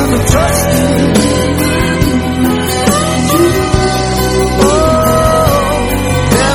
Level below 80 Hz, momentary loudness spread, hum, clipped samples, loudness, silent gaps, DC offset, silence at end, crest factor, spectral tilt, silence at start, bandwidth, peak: -22 dBFS; 3 LU; none; 0.3%; -11 LUFS; none; under 0.1%; 0 s; 10 dB; -5 dB/octave; 0 s; over 20 kHz; 0 dBFS